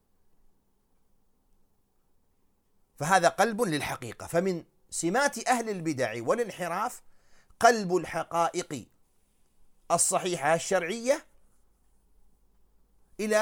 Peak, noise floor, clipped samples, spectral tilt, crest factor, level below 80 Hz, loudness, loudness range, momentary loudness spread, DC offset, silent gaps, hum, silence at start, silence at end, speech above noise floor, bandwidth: -6 dBFS; -68 dBFS; under 0.1%; -3.5 dB/octave; 24 dB; -64 dBFS; -28 LUFS; 3 LU; 12 LU; under 0.1%; none; none; 3 s; 0 s; 41 dB; 17.5 kHz